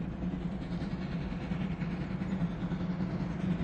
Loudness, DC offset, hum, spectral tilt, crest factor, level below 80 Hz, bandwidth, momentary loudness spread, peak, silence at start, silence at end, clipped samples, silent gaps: -36 LUFS; under 0.1%; none; -8.5 dB/octave; 12 dB; -46 dBFS; 7.4 kHz; 3 LU; -22 dBFS; 0 s; 0 s; under 0.1%; none